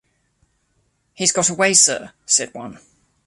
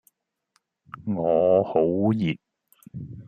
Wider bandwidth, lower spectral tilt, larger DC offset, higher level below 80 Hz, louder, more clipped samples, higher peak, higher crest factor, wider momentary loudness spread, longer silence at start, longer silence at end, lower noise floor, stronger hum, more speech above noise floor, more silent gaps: second, 12 kHz vs 14 kHz; second, -1 dB/octave vs -9 dB/octave; neither; about the same, -62 dBFS vs -62 dBFS; first, -16 LUFS vs -23 LUFS; neither; first, 0 dBFS vs -8 dBFS; about the same, 22 dB vs 18 dB; about the same, 20 LU vs 20 LU; first, 1.2 s vs 0.95 s; first, 0.5 s vs 0.05 s; second, -66 dBFS vs -71 dBFS; neither; about the same, 47 dB vs 49 dB; neither